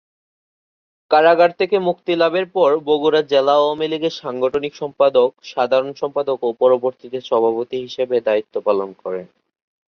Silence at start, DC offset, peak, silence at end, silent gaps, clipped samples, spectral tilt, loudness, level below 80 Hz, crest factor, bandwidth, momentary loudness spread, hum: 1.1 s; under 0.1%; -2 dBFS; 0.65 s; none; under 0.1%; -5.5 dB/octave; -18 LUFS; -66 dBFS; 16 dB; 6.6 kHz; 9 LU; none